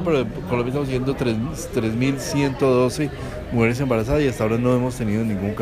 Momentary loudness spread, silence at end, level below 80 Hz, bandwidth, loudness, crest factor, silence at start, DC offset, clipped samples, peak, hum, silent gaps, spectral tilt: 6 LU; 0 s; -38 dBFS; 15.5 kHz; -22 LUFS; 16 dB; 0 s; under 0.1%; under 0.1%; -4 dBFS; none; none; -6.5 dB/octave